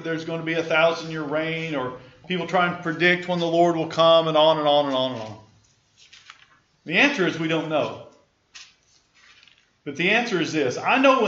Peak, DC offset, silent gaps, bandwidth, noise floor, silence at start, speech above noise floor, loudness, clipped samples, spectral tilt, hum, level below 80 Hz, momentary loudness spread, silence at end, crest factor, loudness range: -4 dBFS; under 0.1%; none; 7.8 kHz; -60 dBFS; 0 s; 39 dB; -21 LUFS; under 0.1%; -5 dB/octave; none; -68 dBFS; 12 LU; 0 s; 18 dB; 6 LU